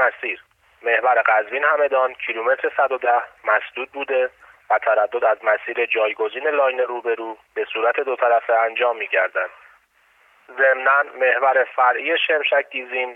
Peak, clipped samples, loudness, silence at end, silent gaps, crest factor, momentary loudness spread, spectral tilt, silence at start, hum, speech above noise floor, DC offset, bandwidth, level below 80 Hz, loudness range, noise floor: -4 dBFS; under 0.1%; -20 LUFS; 0 s; none; 16 dB; 9 LU; -3.5 dB/octave; 0 s; none; 38 dB; under 0.1%; 4 kHz; -72 dBFS; 2 LU; -58 dBFS